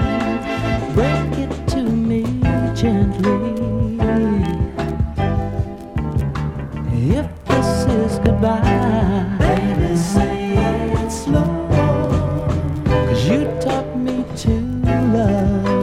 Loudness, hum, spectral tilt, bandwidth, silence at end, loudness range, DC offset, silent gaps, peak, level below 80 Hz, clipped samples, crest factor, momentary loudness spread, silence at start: -18 LUFS; none; -7.5 dB/octave; 14 kHz; 0 s; 3 LU; under 0.1%; none; 0 dBFS; -28 dBFS; under 0.1%; 16 dB; 6 LU; 0 s